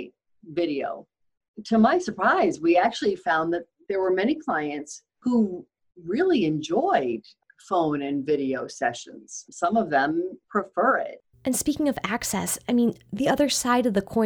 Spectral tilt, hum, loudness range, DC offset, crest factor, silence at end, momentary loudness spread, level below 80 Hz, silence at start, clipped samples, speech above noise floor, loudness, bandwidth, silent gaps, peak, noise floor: -4.5 dB/octave; none; 3 LU; under 0.1%; 18 dB; 0 s; 13 LU; -60 dBFS; 0 s; under 0.1%; 22 dB; -24 LUFS; over 20 kHz; 1.48-1.54 s; -6 dBFS; -46 dBFS